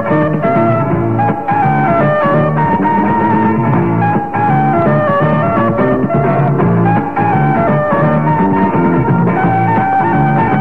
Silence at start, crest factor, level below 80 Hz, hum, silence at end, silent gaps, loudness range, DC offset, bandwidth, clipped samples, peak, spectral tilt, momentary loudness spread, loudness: 0 s; 10 dB; -38 dBFS; none; 0 s; none; 0 LU; 2%; 4.4 kHz; under 0.1%; -2 dBFS; -10.5 dB/octave; 2 LU; -12 LUFS